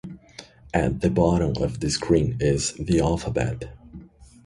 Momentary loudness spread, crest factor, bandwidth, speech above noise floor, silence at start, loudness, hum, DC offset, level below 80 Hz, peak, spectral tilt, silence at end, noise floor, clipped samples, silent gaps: 20 LU; 18 dB; 11.5 kHz; 24 dB; 0.05 s; -23 LUFS; none; under 0.1%; -38 dBFS; -6 dBFS; -6 dB/octave; 0.2 s; -47 dBFS; under 0.1%; none